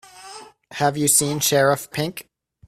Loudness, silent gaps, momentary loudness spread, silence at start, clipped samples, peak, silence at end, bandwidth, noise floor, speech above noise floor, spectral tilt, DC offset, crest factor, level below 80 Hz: -19 LUFS; none; 22 LU; 0.15 s; under 0.1%; -4 dBFS; 0.45 s; 16 kHz; -42 dBFS; 22 dB; -3 dB/octave; under 0.1%; 18 dB; -60 dBFS